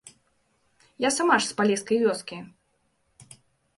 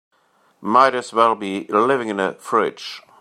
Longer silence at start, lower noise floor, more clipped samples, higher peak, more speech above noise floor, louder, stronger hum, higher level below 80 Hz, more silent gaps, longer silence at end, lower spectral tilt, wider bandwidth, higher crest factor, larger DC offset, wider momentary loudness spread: first, 1 s vs 0.6 s; first, -71 dBFS vs -60 dBFS; neither; second, -8 dBFS vs -2 dBFS; first, 47 dB vs 42 dB; second, -24 LUFS vs -18 LUFS; neither; about the same, -72 dBFS vs -70 dBFS; neither; first, 0.55 s vs 0.2 s; second, -3 dB/octave vs -4.5 dB/octave; second, 11.5 kHz vs 13 kHz; about the same, 20 dB vs 18 dB; neither; about the same, 14 LU vs 13 LU